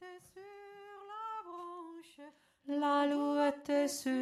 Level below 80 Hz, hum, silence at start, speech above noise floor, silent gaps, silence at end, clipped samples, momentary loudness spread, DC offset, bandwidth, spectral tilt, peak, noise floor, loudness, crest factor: -84 dBFS; none; 0 s; 25 dB; none; 0 s; under 0.1%; 22 LU; under 0.1%; 14 kHz; -2.5 dB/octave; -20 dBFS; -57 dBFS; -35 LUFS; 16 dB